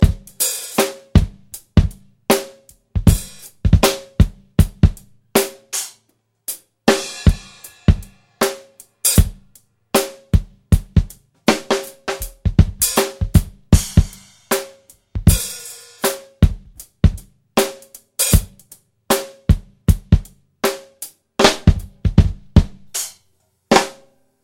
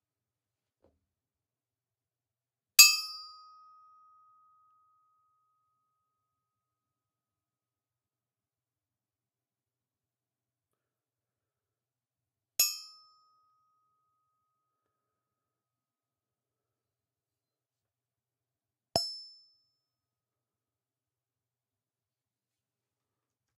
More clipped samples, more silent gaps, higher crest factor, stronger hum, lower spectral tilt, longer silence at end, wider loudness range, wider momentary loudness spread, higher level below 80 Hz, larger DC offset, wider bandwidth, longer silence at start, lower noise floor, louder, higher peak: neither; neither; second, 18 dB vs 36 dB; neither; first, -5 dB/octave vs 2 dB/octave; second, 0.5 s vs 4.35 s; second, 3 LU vs 14 LU; second, 15 LU vs 25 LU; first, -24 dBFS vs -78 dBFS; neither; first, 17 kHz vs 14 kHz; second, 0 s vs 2.8 s; second, -64 dBFS vs under -90 dBFS; first, -18 LUFS vs -24 LUFS; about the same, 0 dBFS vs -2 dBFS